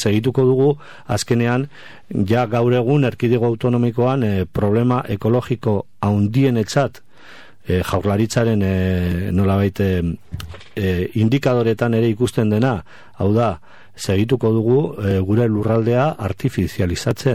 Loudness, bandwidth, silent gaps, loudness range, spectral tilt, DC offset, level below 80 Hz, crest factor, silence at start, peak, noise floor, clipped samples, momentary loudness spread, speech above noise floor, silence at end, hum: -18 LUFS; 15 kHz; none; 2 LU; -7 dB/octave; 1%; -44 dBFS; 14 dB; 0 s; -4 dBFS; -44 dBFS; under 0.1%; 7 LU; 27 dB; 0 s; none